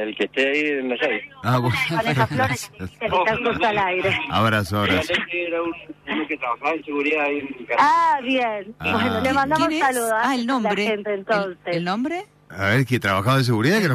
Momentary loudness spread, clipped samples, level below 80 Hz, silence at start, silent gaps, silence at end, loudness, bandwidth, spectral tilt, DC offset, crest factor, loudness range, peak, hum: 7 LU; under 0.1%; -54 dBFS; 0 s; none; 0 s; -21 LUFS; 15.5 kHz; -5.5 dB/octave; under 0.1%; 14 dB; 2 LU; -6 dBFS; none